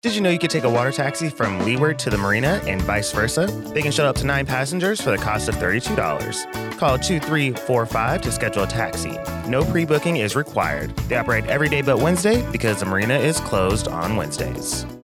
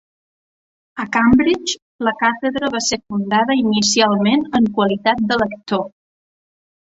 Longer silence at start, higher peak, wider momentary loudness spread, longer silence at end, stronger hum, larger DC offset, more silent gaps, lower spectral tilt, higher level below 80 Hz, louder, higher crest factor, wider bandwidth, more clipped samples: second, 0.05 s vs 0.95 s; second, -6 dBFS vs -2 dBFS; second, 5 LU vs 9 LU; second, 0.05 s vs 1 s; neither; neither; second, none vs 1.82-1.99 s; about the same, -5 dB/octave vs -4 dB/octave; first, -38 dBFS vs -48 dBFS; second, -21 LUFS vs -17 LUFS; about the same, 14 dB vs 16 dB; first, over 20 kHz vs 8 kHz; neither